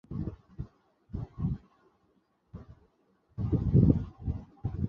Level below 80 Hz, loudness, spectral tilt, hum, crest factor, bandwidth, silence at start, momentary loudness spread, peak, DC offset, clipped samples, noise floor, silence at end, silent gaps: -42 dBFS; -31 LUFS; -12.5 dB/octave; none; 24 dB; 3.8 kHz; 0.1 s; 25 LU; -8 dBFS; under 0.1%; under 0.1%; -71 dBFS; 0 s; none